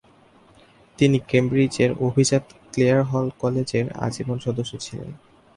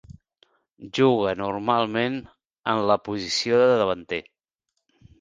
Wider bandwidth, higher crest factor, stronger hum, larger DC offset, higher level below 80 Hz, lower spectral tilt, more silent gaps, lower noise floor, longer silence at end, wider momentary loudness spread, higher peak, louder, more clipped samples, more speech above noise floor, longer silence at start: first, 11.5 kHz vs 9.6 kHz; about the same, 18 dB vs 20 dB; neither; neither; about the same, -54 dBFS vs -58 dBFS; about the same, -6 dB/octave vs -5 dB/octave; second, none vs 2.59-2.63 s; second, -54 dBFS vs -80 dBFS; second, 0.4 s vs 1 s; about the same, 12 LU vs 13 LU; about the same, -4 dBFS vs -6 dBFS; about the same, -22 LUFS vs -23 LUFS; neither; second, 32 dB vs 57 dB; first, 1 s vs 0.1 s